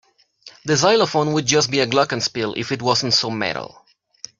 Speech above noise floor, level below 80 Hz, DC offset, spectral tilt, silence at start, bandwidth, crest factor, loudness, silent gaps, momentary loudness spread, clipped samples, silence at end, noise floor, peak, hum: 29 dB; -58 dBFS; under 0.1%; -3.5 dB/octave; 0.45 s; 9.4 kHz; 18 dB; -18 LUFS; none; 12 LU; under 0.1%; 0.7 s; -48 dBFS; -2 dBFS; none